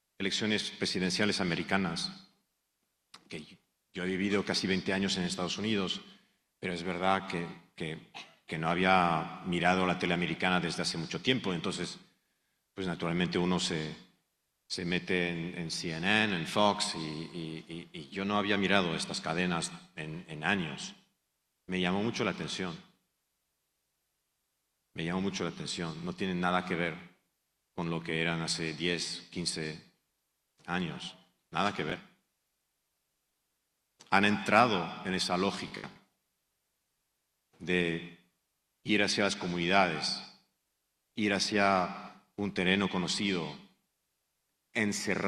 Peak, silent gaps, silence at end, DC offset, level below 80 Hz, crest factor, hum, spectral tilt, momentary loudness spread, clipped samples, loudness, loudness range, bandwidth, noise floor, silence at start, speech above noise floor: -8 dBFS; none; 0 s; under 0.1%; -66 dBFS; 26 dB; none; -4.5 dB/octave; 15 LU; under 0.1%; -32 LUFS; 7 LU; 13 kHz; -81 dBFS; 0.2 s; 49 dB